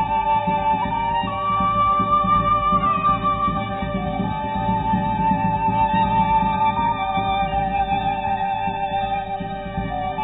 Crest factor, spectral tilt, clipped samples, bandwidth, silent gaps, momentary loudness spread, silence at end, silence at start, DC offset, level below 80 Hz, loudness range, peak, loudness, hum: 12 dB; -10 dB/octave; under 0.1%; 4 kHz; none; 7 LU; 0 s; 0 s; under 0.1%; -36 dBFS; 3 LU; -8 dBFS; -21 LUFS; none